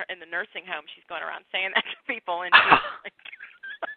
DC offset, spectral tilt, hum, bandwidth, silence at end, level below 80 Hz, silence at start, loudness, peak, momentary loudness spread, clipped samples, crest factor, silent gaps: under 0.1%; -6 dB/octave; none; 4.7 kHz; 0 s; -62 dBFS; 0 s; -23 LUFS; 0 dBFS; 23 LU; under 0.1%; 26 dB; none